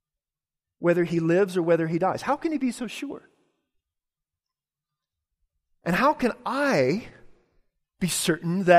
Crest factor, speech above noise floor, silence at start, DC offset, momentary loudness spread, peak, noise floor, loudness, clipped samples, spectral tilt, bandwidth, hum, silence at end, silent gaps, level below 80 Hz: 20 dB; over 67 dB; 0.8 s; under 0.1%; 11 LU; -6 dBFS; under -90 dBFS; -25 LUFS; under 0.1%; -5 dB/octave; 15.5 kHz; none; 0 s; none; -60 dBFS